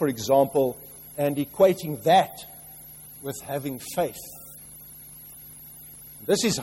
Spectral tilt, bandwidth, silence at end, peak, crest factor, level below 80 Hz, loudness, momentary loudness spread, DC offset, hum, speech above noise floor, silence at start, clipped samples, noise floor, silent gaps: -4.5 dB/octave; 16.5 kHz; 0 s; -6 dBFS; 20 dB; -60 dBFS; -24 LUFS; 21 LU; under 0.1%; none; 21 dB; 0 s; under 0.1%; -45 dBFS; none